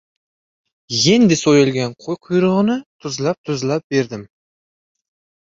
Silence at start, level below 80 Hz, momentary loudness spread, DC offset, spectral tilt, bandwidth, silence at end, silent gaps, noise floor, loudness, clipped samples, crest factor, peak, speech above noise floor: 0.9 s; -56 dBFS; 13 LU; under 0.1%; -5 dB/octave; 7.8 kHz; 1.15 s; 2.86-2.99 s, 3.38-3.44 s, 3.84-3.90 s; under -90 dBFS; -17 LUFS; under 0.1%; 18 dB; -2 dBFS; over 74 dB